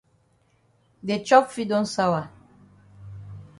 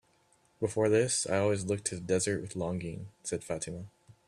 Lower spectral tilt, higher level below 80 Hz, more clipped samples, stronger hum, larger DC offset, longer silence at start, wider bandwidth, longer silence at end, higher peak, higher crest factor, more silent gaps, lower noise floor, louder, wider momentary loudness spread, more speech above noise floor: about the same, -5 dB/octave vs -4.5 dB/octave; about the same, -60 dBFS vs -64 dBFS; neither; neither; neither; first, 1.05 s vs 0.6 s; second, 11.5 kHz vs 13 kHz; about the same, 0.15 s vs 0.15 s; first, -2 dBFS vs -16 dBFS; first, 24 dB vs 18 dB; neither; second, -64 dBFS vs -68 dBFS; first, -22 LUFS vs -32 LUFS; first, 24 LU vs 13 LU; first, 42 dB vs 37 dB